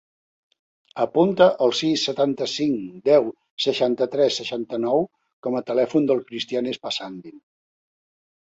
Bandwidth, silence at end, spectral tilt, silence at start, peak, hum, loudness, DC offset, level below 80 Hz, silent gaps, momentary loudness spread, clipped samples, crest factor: 8 kHz; 1.1 s; -5 dB/octave; 0.95 s; -4 dBFS; none; -22 LUFS; under 0.1%; -68 dBFS; 3.51-3.57 s, 5.33-5.43 s; 11 LU; under 0.1%; 20 dB